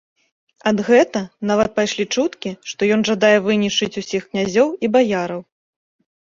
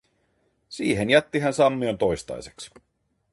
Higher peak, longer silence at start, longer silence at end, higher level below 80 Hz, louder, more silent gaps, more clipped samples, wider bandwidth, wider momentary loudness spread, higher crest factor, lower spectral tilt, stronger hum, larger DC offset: about the same, -2 dBFS vs -4 dBFS; about the same, 0.65 s vs 0.7 s; first, 0.9 s vs 0.65 s; about the same, -56 dBFS vs -52 dBFS; first, -18 LUFS vs -23 LUFS; neither; neither; second, 7.6 kHz vs 11.5 kHz; second, 10 LU vs 21 LU; about the same, 18 dB vs 22 dB; about the same, -4.5 dB/octave vs -5 dB/octave; neither; neither